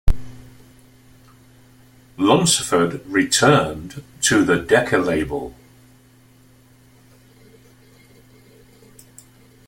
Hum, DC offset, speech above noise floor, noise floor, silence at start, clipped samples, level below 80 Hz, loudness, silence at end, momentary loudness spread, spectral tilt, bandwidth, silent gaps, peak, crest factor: none; under 0.1%; 33 dB; -51 dBFS; 0.05 s; under 0.1%; -34 dBFS; -18 LUFS; 4.15 s; 15 LU; -4 dB/octave; 16.5 kHz; none; 0 dBFS; 20 dB